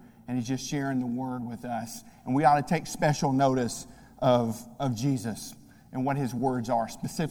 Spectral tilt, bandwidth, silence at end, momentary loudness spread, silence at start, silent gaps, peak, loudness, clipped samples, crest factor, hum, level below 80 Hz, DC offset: -6 dB/octave; 18 kHz; 0 s; 12 LU; 0 s; none; -8 dBFS; -28 LUFS; under 0.1%; 20 dB; none; -56 dBFS; under 0.1%